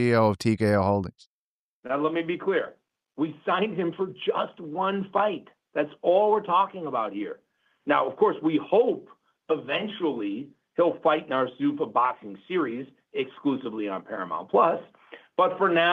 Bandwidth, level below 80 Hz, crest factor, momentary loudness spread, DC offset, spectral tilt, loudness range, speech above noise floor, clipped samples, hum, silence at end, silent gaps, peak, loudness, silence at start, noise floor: 12.5 kHz; -68 dBFS; 18 dB; 11 LU; under 0.1%; -7 dB/octave; 3 LU; over 65 dB; under 0.1%; none; 0 s; 1.27-1.83 s; -8 dBFS; -26 LUFS; 0 s; under -90 dBFS